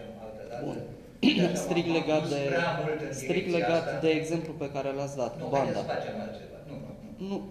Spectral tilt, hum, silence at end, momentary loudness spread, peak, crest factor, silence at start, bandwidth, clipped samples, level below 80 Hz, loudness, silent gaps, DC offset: -5.5 dB/octave; none; 0 s; 16 LU; -10 dBFS; 20 dB; 0 s; 14 kHz; under 0.1%; -58 dBFS; -29 LUFS; none; under 0.1%